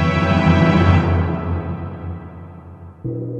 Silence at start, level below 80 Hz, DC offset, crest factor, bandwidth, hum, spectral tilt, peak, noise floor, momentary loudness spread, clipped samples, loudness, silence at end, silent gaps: 0 s; -34 dBFS; under 0.1%; 16 dB; 7.6 kHz; none; -8 dB/octave; -2 dBFS; -37 dBFS; 23 LU; under 0.1%; -17 LUFS; 0 s; none